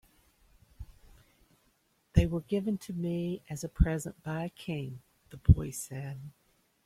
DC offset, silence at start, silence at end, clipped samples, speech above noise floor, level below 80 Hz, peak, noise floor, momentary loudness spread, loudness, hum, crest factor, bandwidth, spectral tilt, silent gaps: under 0.1%; 0.8 s; 0.55 s; under 0.1%; 41 dB; -40 dBFS; -8 dBFS; -72 dBFS; 25 LU; -32 LUFS; none; 26 dB; 15 kHz; -7 dB/octave; none